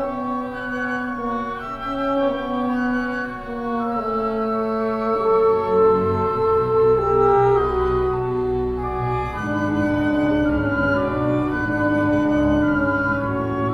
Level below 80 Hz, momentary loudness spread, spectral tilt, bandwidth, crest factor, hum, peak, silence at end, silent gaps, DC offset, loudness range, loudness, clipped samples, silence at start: -38 dBFS; 8 LU; -8.5 dB/octave; 7 kHz; 14 dB; none; -6 dBFS; 0 s; none; under 0.1%; 6 LU; -21 LUFS; under 0.1%; 0 s